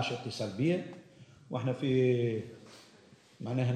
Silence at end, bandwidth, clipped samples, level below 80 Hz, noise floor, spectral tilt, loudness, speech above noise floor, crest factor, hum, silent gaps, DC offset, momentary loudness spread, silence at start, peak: 0 s; 9.6 kHz; under 0.1%; -72 dBFS; -60 dBFS; -7 dB/octave; -32 LUFS; 28 dB; 16 dB; none; none; under 0.1%; 21 LU; 0 s; -18 dBFS